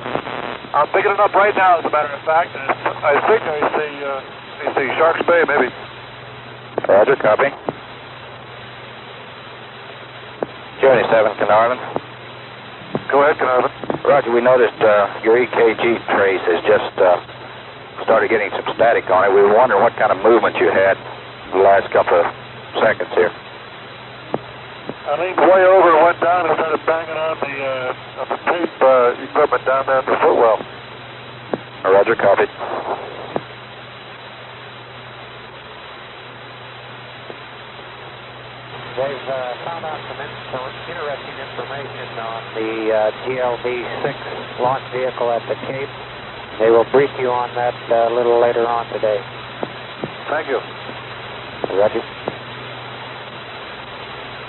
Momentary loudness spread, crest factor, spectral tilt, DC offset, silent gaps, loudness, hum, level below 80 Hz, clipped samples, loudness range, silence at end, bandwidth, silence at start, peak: 21 LU; 16 dB; -3 dB/octave; under 0.1%; none; -17 LUFS; none; -56 dBFS; under 0.1%; 13 LU; 0 s; 4.2 kHz; 0 s; -2 dBFS